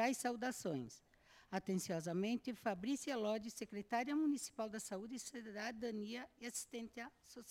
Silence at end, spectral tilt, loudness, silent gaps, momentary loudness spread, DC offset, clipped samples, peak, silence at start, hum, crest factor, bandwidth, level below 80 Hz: 0 s; -4.5 dB/octave; -43 LUFS; none; 10 LU; under 0.1%; under 0.1%; -24 dBFS; 0 s; none; 18 dB; 16.5 kHz; -78 dBFS